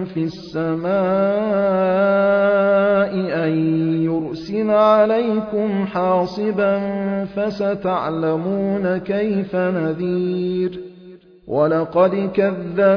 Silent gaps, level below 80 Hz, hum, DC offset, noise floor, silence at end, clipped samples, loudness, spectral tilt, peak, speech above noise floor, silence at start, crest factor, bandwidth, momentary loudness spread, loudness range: none; -54 dBFS; none; under 0.1%; -43 dBFS; 0 s; under 0.1%; -19 LUFS; -9 dB/octave; -4 dBFS; 25 dB; 0 s; 14 dB; 5.4 kHz; 8 LU; 4 LU